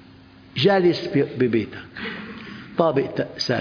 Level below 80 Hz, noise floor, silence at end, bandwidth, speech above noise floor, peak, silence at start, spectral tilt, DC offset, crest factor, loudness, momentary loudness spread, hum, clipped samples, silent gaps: -58 dBFS; -47 dBFS; 0 s; 5.4 kHz; 26 dB; -4 dBFS; 0.55 s; -6.5 dB/octave; under 0.1%; 20 dB; -22 LUFS; 15 LU; none; under 0.1%; none